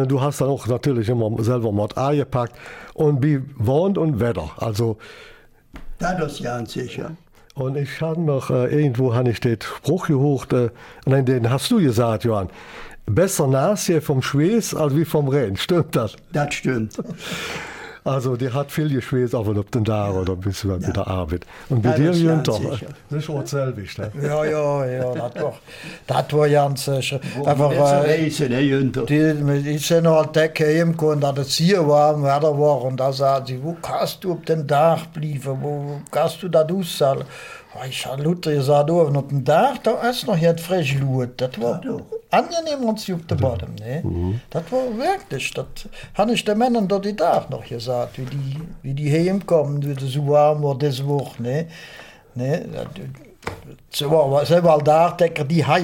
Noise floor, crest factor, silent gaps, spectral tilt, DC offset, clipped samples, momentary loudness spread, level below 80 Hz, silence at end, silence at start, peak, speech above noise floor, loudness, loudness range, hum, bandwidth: -42 dBFS; 16 dB; none; -6.5 dB/octave; under 0.1%; under 0.1%; 12 LU; -48 dBFS; 0 s; 0 s; -4 dBFS; 23 dB; -20 LUFS; 6 LU; none; 17 kHz